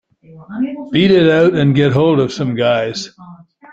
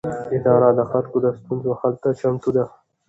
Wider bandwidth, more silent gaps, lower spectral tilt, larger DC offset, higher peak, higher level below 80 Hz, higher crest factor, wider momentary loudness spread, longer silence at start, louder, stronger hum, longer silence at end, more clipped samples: about the same, 7.8 kHz vs 8 kHz; neither; second, -7 dB/octave vs -10 dB/octave; neither; about the same, -2 dBFS vs -2 dBFS; first, -50 dBFS vs -56 dBFS; about the same, 14 dB vs 18 dB; first, 13 LU vs 9 LU; first, 0.35 s vs 0.05 s; first, -14 LUFS vs -20 LUFS; neither; about the same, 0.4 s vs 0.4 s; neither